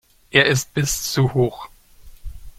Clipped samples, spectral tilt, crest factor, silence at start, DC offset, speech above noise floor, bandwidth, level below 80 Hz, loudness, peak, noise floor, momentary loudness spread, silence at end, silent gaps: under 0.1%; -4 dB/octave; 20 dB; 0.35 s; under 0.1%; 25 dB; 16.5 kHz; -40 dBFS; -19 LUFS; 0 dBFS; -44 dBFS; 7 LU; 0.1 s; none